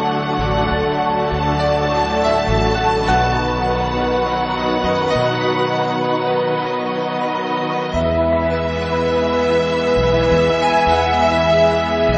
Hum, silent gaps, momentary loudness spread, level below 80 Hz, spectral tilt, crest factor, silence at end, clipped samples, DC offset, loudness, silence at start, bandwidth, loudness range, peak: none; none; 5 LU; -30 dBFS; -6 dB/octave; 14 dB; 0 s; under 0.1%; under 0.1%; -17 LUFS; 0 s; 8 kHz; 3 LU; -4 dBFS